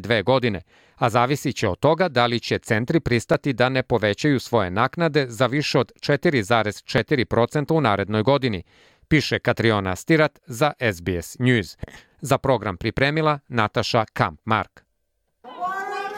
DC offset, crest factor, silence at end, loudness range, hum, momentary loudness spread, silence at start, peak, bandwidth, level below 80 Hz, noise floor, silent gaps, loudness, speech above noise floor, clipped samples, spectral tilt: under 0.1%; 18 dB; 0 s; 2 LU; none; 7 LU; 0 s; -4 dBFS; 16.5 kHz; -48 dBFS; -72 dBFS; none; -21 LUFS; 51 dB; under 0.1%; -6 dB/octave